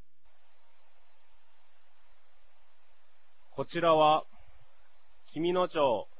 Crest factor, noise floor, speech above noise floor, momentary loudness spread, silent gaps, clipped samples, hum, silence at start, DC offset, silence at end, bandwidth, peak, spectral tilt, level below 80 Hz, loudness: 22 dB; -71 dBFS; 44 dB; 18 LU; none; under 0.1%; 50 Hz at -85 dBFS; 3.55 s; 0.8%; 0.15 s; 4 kHz; -12 dBFS; -3.5 dB/octave; -68 dBFS; -28 LUFS